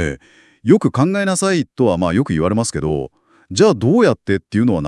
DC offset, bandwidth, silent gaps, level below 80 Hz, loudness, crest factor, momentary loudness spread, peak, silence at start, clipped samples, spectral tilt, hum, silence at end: under 0.1%; 12 kHz; none; -44 dBFS; -16 LUFS; 16 dB; 11 LU; 0 dBFS; 0 s; under 0.1%; -6 dB/octave; none; 0 s